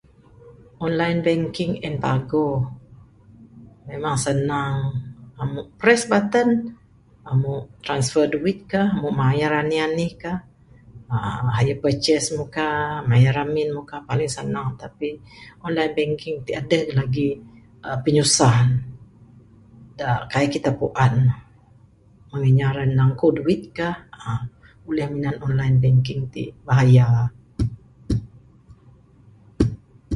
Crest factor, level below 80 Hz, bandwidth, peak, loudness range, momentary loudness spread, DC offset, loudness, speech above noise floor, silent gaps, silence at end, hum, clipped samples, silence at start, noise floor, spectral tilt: 20 dB; -44 dBFS; 11.5 kHz; 0 dBFS; 5 LU; 13 LU; under 0.1%; -21 LUFS; 32 dB; none; 0 s; none; under 0.1%; 0.45 s; -52 dBFS; -6 dB/octave